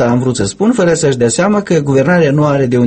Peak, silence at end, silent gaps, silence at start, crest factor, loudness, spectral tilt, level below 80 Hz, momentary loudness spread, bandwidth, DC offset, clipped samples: 0 dBFS; 0 s; none; 0 s; 10 dB; -11 LUFS; -6 dB/octave; -42 dBFS; 3 LU; 8.8 kHz; under 0.1%; under 0.1%